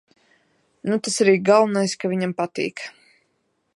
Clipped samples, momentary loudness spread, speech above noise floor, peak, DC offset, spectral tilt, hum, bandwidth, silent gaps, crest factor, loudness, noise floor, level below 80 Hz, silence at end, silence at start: under 0.1%; 15 LU; 50 dB; -4 dBFS; under 0.1%; -4.5 dB/octave; none; 11.5 kHz; none; 20 dB; -21 LUFS; -70 dBFS; -72 dBFS; 0.85 s; 0.85 s